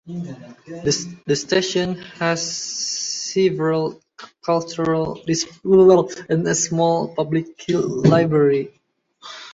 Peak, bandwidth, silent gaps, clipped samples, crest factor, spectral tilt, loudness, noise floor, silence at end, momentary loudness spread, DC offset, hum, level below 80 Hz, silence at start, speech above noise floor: -2 dBFS; 8 kHz; none; under 0.1%; 18 dB; -4.5 dB/octave; -19 LUFS; -48 dBFS; 0 s; 14 LU; under 0.1%; none; -56 dBFS; 0.05 s; 29 dB